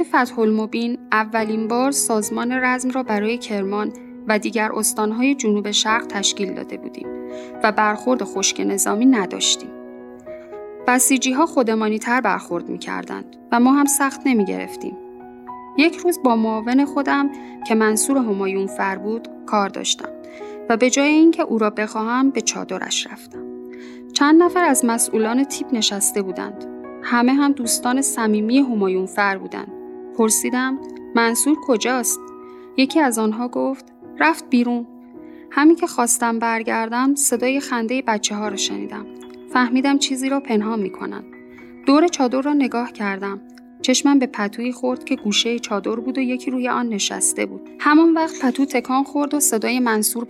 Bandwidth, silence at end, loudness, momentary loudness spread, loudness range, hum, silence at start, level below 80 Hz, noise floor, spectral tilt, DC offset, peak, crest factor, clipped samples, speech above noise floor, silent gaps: 16 kHz; 0 s; -19 LUFS; 16 LU; 2 LU; none; 0 s; -64 dBFS; -40 dBFS; -3 dB/octave; under 0.1%; 0 dBFS; 20 dB; under 0.1%; 21 dB; none